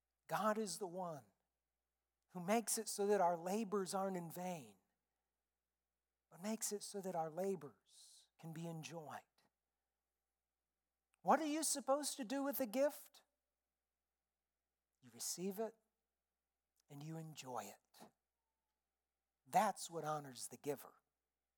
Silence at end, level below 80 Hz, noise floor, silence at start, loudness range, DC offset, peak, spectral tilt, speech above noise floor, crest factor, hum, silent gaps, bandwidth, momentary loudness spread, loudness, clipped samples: 0.65 s; under -90 dBFS; under -90 dBFS; 0.3 s; 12 LU; under 0.1%; -22 dBFS; -4 dB/octave; over 48 dB; 24 dB; none; none; 18 kHz; 18 LU; -43 LUFS; under 0.1%